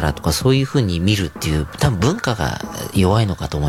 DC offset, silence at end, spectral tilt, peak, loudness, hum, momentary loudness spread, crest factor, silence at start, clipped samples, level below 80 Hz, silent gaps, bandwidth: under 0.1%; 0 s; -5.5 dB/octave; -2 dBFS; -18 LUFS; none; 6 LU; 16 dB; 0 s; under 0.1%; -34 dBFS; none; 16.5 kHz